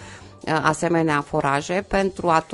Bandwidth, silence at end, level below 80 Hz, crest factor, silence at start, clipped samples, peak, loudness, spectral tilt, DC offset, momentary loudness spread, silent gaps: 11.5 kHz; 0 s; -46 dBFS; 20 dB; 0 s; under 0.1%; -2 dBFS; -22 LUFS; -5.5 dB/octave; under 0.1%; 5 LU; none